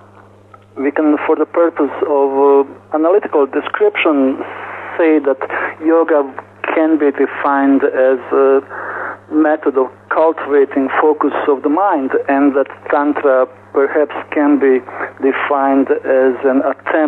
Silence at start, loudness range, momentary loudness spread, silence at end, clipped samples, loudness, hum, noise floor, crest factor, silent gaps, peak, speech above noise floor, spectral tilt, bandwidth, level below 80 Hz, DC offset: 0.75 s; 1 LU; 7 LU; 0 s; under 0.1%; -14 LUFS; none; -43 dBFS; 10 dB; none; -2 dBFS; 29 dB; -7.5 dB/octave; 4 kHz; -66 dBFS; under 0.1%